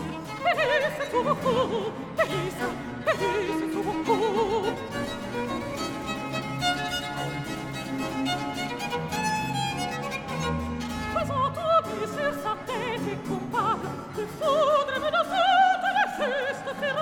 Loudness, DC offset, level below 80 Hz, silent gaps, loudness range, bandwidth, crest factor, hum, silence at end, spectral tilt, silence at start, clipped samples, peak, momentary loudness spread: -27 LUFS; under 0.1%; -52 dBFS; none; 5 LU; 19 kHz; 16 dB; none; 0 s; -4.5 dB/octave; 0 s; under 0.1%; -10 dBFS; 9 LU